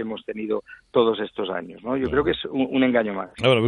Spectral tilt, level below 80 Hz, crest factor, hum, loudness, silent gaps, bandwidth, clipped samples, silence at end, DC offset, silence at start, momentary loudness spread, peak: -7 dB/octave; -50 dBFS; 18 dB; none; -24 LUFS; none; 10 kHz; under 0.1%; 0 s; under 0.1%; 0 s; 9 LU; -6 dBFS